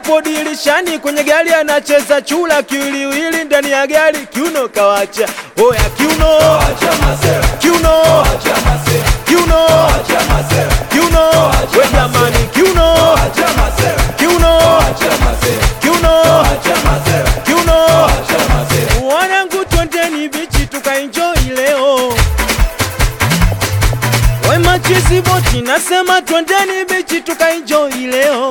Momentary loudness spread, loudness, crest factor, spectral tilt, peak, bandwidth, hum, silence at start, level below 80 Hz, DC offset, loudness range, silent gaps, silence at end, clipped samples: 6 LU; -11 LUFS; 10 dB; -4 dB/octave; 0 dBFS; 19.5 kHz; none; 0 s; -18 dBFS; 0.2%; 3 LU; none; 0 s; under 0.1%